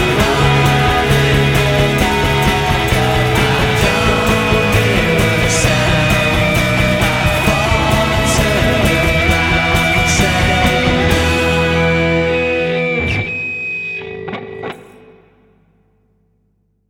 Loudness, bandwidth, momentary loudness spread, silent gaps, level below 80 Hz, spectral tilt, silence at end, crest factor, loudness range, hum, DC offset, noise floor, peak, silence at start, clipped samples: -13 LUFS; 18 kHz; 7 LU; none; -24 dBFS; -4.5 dB/octave; 2.05 s; 14 dB; 7 LU; none; under 0.1%; -61 dBFS; 0 dBFS; 0 s; under 0.1%